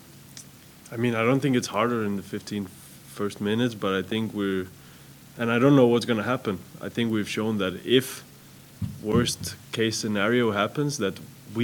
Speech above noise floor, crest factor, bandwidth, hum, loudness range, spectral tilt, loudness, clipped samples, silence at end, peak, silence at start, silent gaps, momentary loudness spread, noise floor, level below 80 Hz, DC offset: 24 dB; 20 dB; 19 kHz; none; 4 LU; -5 dB/octave; -25 LUFS; under 0.1%; 0 s; -6 dBFS; 0.1 s; none; 17 LU; -49 dBFS; -56 dBFS; under 0.1%